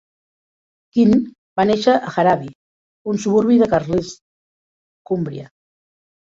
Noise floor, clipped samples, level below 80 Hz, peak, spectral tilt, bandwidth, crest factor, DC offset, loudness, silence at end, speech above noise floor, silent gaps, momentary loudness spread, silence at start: under -90 dBFS; under 0.1%; -52 dBFS; -2 dBFS; -6.5 dB/octave; 7.8 kHz; 18 dB; under 0.1%; -18 LUFS; 0.85 s; over 74 dB; 1.38-1.56 s, 2.55-3.05 s, 4.21-5.05 s; 14 LU; 0.95 s